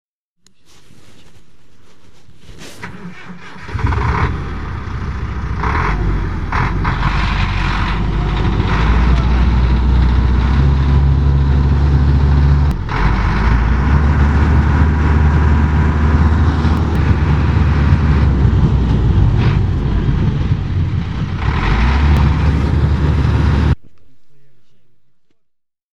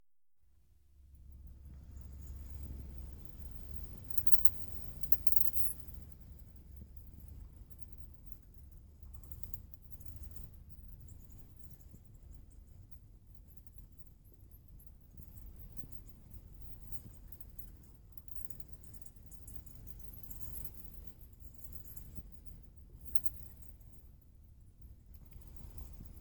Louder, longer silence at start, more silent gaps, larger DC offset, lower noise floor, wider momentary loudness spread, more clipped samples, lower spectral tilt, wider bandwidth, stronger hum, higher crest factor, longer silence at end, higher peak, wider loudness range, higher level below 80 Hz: first, -15 LUFS vs -32 LUFS; about the same, 0.05 s vs 0 s; neither; first, 3% vs under 0.1%; second, -63 dBFS vs -78 dBFS; second, 9 LU vs 26 LU; neither; first, -8 dB/octave vs -5.5 dB/octave; second, 7 kHz vs 19.5 kHz; neither; second, 14 dB vs 34 dB; about the same, 0 s vs 0 s; first, 0 dBFS vs -6 dBFS; second, 7 LU vs 25 LU; first, -16 dBFS vs -54 dBFS